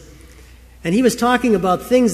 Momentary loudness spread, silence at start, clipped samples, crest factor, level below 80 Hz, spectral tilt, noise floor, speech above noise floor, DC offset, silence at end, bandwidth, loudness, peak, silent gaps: 5 LU; 0.25 s; under 0.1%; 16 dB; -44 dBFS; -5 dB/octave; -43 dBFS; 27 dB; under 0.1%; 0 s; 15 kHz; -17 LUFS; -2 dBFS; none